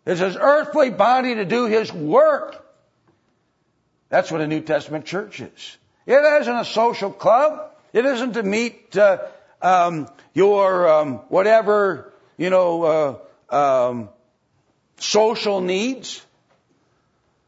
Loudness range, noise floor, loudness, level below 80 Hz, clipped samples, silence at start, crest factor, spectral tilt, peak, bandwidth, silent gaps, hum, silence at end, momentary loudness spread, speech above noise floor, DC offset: 6 LU; -67 dBFS; -19 LUFS; -72 dBFS; under 0.1%; 0.05 s; 16 dB; -4.5 dB/octave; -4 dBFS; 8 kHz; none; none; 1.3 s; 15 LU; 49 dB; under 0.1%